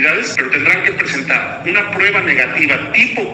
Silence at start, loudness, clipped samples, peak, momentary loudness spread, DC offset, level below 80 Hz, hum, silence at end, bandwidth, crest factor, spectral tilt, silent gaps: 0 s; -12 LUFS; under 0.1%; 0 dBFS; 4 LU; under 0.1%; -52 dBFS; none; 0 s; 13.5 kHz; 14 dB; -3.5 dB/octave; none